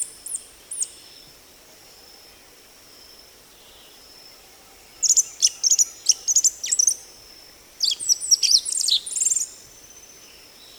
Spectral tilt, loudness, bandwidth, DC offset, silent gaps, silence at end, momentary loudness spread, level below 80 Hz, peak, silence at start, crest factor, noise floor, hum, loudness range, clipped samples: 3.5 dB/octave; -19 LUFS; over 20 kHz; under 0.1%; none; 0.8 s; 14 LU; -64 dBFS; -2 dBFS; 0 s; 24 dB; -49 dBFS; none; 16 LU; under 0.1%